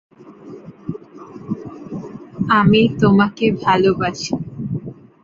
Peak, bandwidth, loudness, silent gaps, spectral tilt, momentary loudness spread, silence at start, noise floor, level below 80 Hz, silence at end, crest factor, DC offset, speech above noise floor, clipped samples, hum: -2 dBFS; 7.6 kHz; -17 LUFS; none; -6.5 dB/octave; 23 LU; 0.25 s; -38 dBFS; -48 dBFS; 0.3 s; 18 dB; under 0.1%; 24 dB; under 0.1%; none